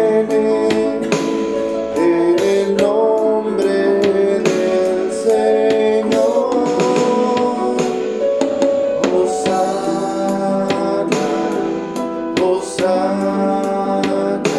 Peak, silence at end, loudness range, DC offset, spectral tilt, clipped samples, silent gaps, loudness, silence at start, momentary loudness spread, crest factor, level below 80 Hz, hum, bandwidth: -2 dBFS; 0 s; 3 LU; under 0.1%; -5.5 dB/octave; under 0.1%; none; -16 LUFS; 0 s; 5 LU; 14 dB; -54 dBFS; none; 12.5 kHz